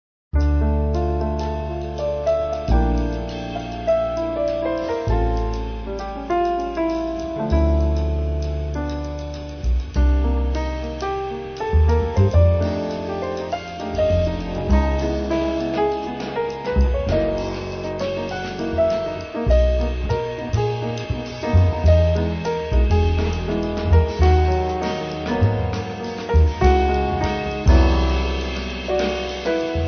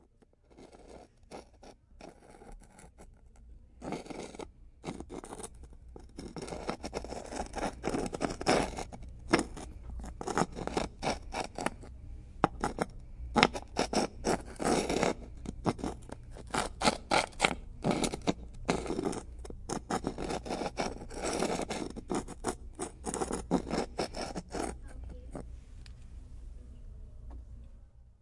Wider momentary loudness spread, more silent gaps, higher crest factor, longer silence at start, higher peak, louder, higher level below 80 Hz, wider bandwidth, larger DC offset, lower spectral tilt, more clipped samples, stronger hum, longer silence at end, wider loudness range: second, 10 LU vs 21 LU; neither; second, 16 dB vs 36 dB; second, 0.35 s vs 0.5 s; second, -4 dBFS vs 0 dBFS; first, -22 LUFS vs -35 LUFS; first, -24 dBFS vs -48 dBFS; second, 6.6 kHz vs 11.5 kHz; neither; first, -7.5 dB/octave vs -4 dB/octave; neither; neither; about the same, 0 s vs 0.1 s; second, 4 LU vs 15 LU